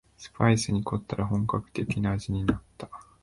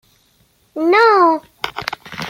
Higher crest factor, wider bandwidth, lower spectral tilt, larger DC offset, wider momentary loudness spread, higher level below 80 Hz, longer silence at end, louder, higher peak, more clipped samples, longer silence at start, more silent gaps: about the same, 20 dB vs 16 dB; second, 11.5 kHz vs 16.5 kHz; first, -6 dB/octave vs -4.5 dB/octave; neither; first, 19 LU vs 16 LU; first, -46 dBFS vs -56 dBFS; first, 0.2 s vs 0 s; second, -28 LUFS vs -14 LUFS; second, -8 dBFS vs -2 dBFS; neither; second, 0.2 s vs 0.75 s; neither